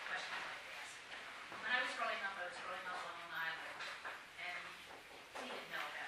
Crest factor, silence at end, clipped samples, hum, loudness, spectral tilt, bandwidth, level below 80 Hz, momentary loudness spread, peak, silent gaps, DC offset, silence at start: 20 dB; 0 s; under 0.1%; none; -44 LUFS; -1 dB/octave; 15.5 kHz; -82 dBFS; 11 LU; -26 dBFS; none; under 0.1%; 0 s